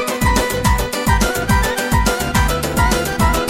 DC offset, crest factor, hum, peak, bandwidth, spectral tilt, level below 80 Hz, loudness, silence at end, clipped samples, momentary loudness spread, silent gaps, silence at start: under 0.1%; 14 dB; none; -2 dBFS; 16.5 kHz; -4.5 dB/octave; -22 dBFS; -16 LUFS; 0 s; under 0.1%; 1 LU; none; 0 s